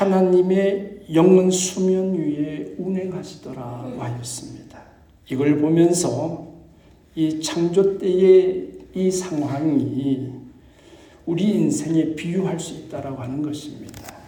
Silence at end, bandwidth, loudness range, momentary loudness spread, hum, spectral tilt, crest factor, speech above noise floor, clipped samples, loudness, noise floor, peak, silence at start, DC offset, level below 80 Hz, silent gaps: 0 s; 19 kHz; 6 LU; 17 LU; none; -6 dB/octave; 18 dB; 30 dB; under 0.1%; -20 LUFS; -50 dBFS; -2 dBFS; 0 s; under 0.1%; -56 dBFS; none